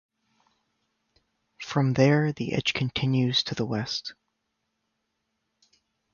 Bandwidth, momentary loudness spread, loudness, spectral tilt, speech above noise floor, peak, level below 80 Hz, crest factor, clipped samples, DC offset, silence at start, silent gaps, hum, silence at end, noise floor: 7.2 kHz; 11 LU; -25 LUFS; -6 dB/octave; 54 dB; -8 dBFS; -60 dBFS; 20 dB; under 0.1%; under 0.1%; 1.6 s; none; none; 2 s; -79 dBFS